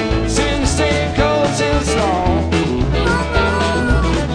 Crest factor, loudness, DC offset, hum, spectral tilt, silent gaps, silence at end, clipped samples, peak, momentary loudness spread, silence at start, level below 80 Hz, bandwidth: 14 dB; -16 LUFS; under 0.1%; none; -5 dB/octave; none; 0 s; under 0.1%; -2 dBFS; 1 LU; 0 s; -22 dBFS; 10 kHz